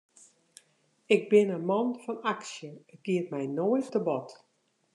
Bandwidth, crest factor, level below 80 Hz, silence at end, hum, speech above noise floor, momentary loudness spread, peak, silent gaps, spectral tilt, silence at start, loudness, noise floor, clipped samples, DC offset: 11 kHz; 20 dB; -88 dBFS; 0.6 s; none; 40 dB; 18 LU; -10 dBFS; none; -6 dB/octave; 1.1 s; -29 LUFS; -68 dBFS; under 0.1%; under 0.1%